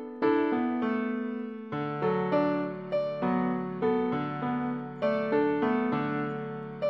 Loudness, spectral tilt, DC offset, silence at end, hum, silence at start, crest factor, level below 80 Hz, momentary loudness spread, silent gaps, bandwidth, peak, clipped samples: -29 LUFS; -9.5 dB/octave; under 0.1%; 0 s; none; 0 s; 14 dB; -72 dBFS; 7 LU; none; 5.8 kHz; -14 dBFS; under 0.1%